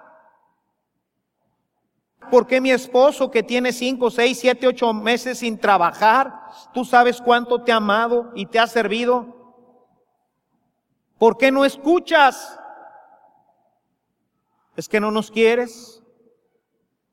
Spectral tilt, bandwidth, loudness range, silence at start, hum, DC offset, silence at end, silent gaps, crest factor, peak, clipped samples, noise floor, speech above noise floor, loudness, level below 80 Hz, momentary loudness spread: -4 dB/octave; 16 kHz; 6 LU; 2.25 s; none; under 0.1%; 1.25 s; none; 20 dB; 0 dBFS; under 0.1%; -76 dBFS; 58 dB; -18 LUFS; -66 dBFS; 8 LU